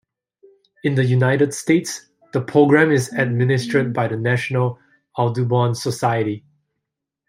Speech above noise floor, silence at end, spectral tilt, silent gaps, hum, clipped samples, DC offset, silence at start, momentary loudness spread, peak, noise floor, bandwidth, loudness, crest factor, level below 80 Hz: 63 dB; 0.9 s; -6.5 dB/octave; none; none; under 0.1%; under 0.1%; 0.85 s; 11 LU; -2 dBFS; -81 dBFS; 15.5 kHz; -19 LUFS; 18 dB; -62 dBFS